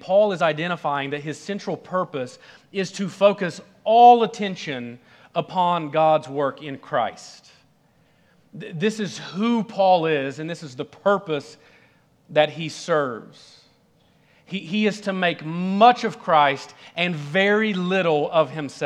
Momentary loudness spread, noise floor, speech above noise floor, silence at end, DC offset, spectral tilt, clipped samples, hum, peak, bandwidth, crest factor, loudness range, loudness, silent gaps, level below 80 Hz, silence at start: 15 LU; -60 dBFS; 38 dB; 0 s; under 0.1%; -5.5 dB/octave; under 0.1%; none; -2 dBFS; 10.5 kHz; 20 dB; 7 LU; -22 LUFS; none; -74 dBFS; 0.05 s